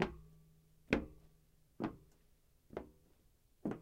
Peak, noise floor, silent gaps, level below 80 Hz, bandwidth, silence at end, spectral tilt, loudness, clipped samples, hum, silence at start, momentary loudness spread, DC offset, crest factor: -14 dBFS; -71 dBFS; none; -60 dBFS; 16 kHz; 0 s; -6.5 dB/octave; -43 LUFS; under 0.1%; none; 0 s; 22 LU; under 0.1%; 30 dB